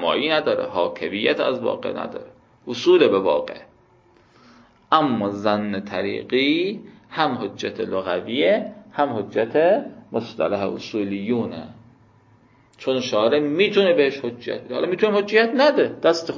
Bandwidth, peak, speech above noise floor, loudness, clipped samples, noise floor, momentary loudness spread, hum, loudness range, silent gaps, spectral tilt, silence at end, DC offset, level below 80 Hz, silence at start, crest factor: 7.4 kHz; -2 dBFS; 35 dB; -21 LUFS; under 0.1%; -55 dBFS; 13 LU; none; 4 LU; none; -5.5 dB/octave; 0 s; under 0.1%; -62 dBFS; 0 s; 20 dB